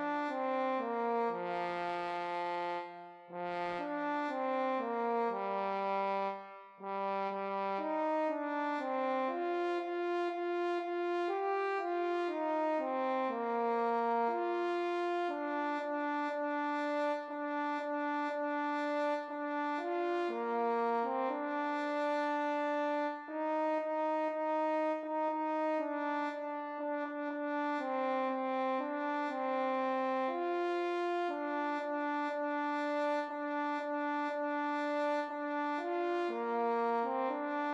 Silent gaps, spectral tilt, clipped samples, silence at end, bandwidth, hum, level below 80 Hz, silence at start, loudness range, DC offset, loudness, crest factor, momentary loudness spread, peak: none; -5.5 dB/octave; under 0.1%; 0 s; 9.4 kHz; none; -90 dBFS; 0 s; 2 LU; under 0.1%; -35 LUFS; 14 dB; 4 LU; -22 dBFS